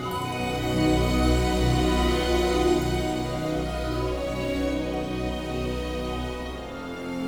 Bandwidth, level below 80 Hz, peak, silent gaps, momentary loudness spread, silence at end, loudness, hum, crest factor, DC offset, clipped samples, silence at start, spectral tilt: 18.5 kHz; -32 dBFS; -10 dBFS; none; 9 LU; 0 s; -26 LUFS; none; 16 dB; 0.2%; under 0.1%; 0 s; -5.5 dB/octave